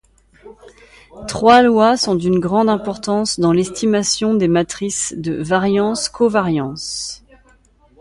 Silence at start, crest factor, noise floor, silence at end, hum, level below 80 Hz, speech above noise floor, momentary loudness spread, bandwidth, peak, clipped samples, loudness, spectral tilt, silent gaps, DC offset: 0.45 s; 16 dB; -52 dBFS; 0.85 s; none; -48 dBFS; 37 dB; 12 LU; 11.5 kHz; 0 dBFS; under 0.1%; -16 LUFS; -4.5 dB/octave; none; under 0.1%